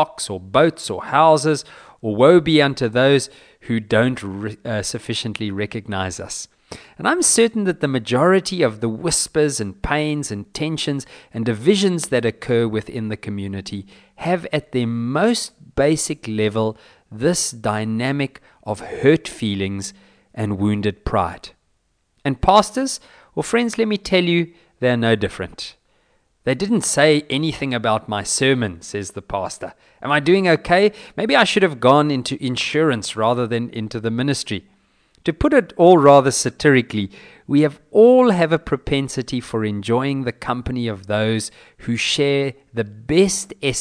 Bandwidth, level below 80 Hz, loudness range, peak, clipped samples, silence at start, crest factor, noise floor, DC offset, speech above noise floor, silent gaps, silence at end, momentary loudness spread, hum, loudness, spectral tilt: 11 kHz; -44 dBFS; 6 LU; 0 dBFS; under 0.1%; 0 s; 18 dB; -66 dBFS; under 0.1%; 47 dB; none; 0 s; 14 LU; none; -19 LUFS; -4.5 dB/octave